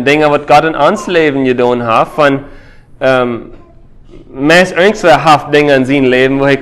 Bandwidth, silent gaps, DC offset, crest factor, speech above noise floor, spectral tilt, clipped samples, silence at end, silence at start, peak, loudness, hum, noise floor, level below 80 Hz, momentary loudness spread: 16 kHz; none; under 0.1%; 10 dB; 27 dB; -5.5 dB/octave; 1%; 0 s; 0 s; 0 dBFS; -9 LUFS; none; -36 dBFS; -40 dBFS; 5 LU